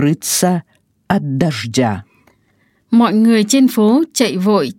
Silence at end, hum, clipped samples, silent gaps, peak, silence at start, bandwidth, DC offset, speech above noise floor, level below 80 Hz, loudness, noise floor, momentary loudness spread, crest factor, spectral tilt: 0.05 s; none; under 0.1%; none; 0 dBFS; 0 s; 17 kHz; under 0.1%; 45 dB; -56 dBFS; -14 LUFS; -58 dBFS; 8 LU; 14 dB; -5 dB/octave